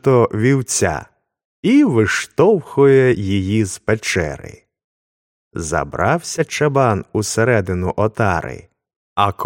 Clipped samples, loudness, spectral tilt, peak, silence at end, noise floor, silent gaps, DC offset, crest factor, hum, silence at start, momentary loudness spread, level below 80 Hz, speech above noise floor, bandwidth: under 0.1%; -17 LUFS; -5.5 dB/octave; 0 dBFS; 0 s; under -90 dBFS; 1.45-1.63 s, 4.84-5.51 s, 8.96-9.16 s; under 0.1%; 16 dB; none; 0.05 s; 11 LU; -44 dBFS; over 74 dB; 16.5 kHz